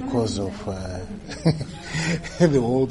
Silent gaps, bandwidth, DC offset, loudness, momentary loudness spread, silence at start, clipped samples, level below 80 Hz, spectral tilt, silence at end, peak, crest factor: none; 11.5 kHz; under 0.1%; -24 LUFS; 13 LU; 0 s; under 0.1%; -42 dBFS; -6 dB/octave; 0 s; -4 dBFS; 20 dB